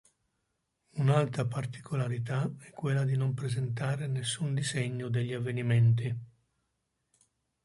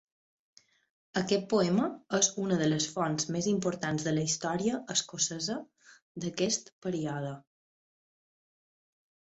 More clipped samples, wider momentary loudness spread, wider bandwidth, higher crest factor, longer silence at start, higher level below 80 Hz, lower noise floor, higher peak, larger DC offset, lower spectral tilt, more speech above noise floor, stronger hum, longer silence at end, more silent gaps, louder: neither; about the same, 10 LU vs 10 LU; first, 11.5 kHz vs 8.2 kHz; about the same, 18 dB vs 22 dB; second, 0.95 s vs 1.15 s; about the same, -66 dBFS vs -70 dBFS; second, -80 dBFS vs under -90 dBFS; about the same, -12 dBFS vs -12 dBFS; neither; first, -6 dB/octave vs -4 dB/octave; second, 50 dB vs over 59 dB; neither; second, 1.4 s vs 1.85 s; second, none vs 6.02-6.15 s, 6.72-6.82 s; about the same, -31 LUFS vs -31 LUFS